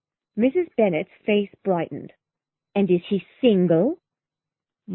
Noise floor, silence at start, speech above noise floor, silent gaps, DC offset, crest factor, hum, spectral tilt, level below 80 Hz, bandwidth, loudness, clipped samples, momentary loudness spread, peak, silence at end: -89 dBFS; 0.35 s; 68 dB; none; under 0.1%; 18 dB; none; -11.5 dB/octave; -64 dBFS; 4.1 kHz; -22 LUFS; under 0.1%; 11 LU; -6 dBFS; 0 s